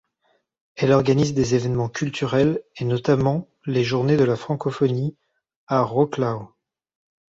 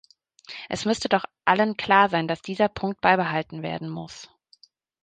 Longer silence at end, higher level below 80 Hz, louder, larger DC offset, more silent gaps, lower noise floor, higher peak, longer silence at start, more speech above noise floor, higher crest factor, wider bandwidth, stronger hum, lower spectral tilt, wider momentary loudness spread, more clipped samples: about the same, 0.85 s vs 0.8 s; first, -52 dBFS vs -60 dBFS; about the same, -22 LUFS vs -23 LUFS; neither; first, 5.56-5.67 s vs none; first, -68 dBFS vs -59 dBFS; about the same, -4 dBFS vs -2 dBFS; first, 0.75 s vs 0.5 s; first, 47 dB vs 35 dB; about the same, 18 dB vs 22 dB; second, 7.8 kHz vs 9.4 kHz; neither; first, -7 dB/octave vs -5 dB/octave; second, 8 LU vs 17 LU; neither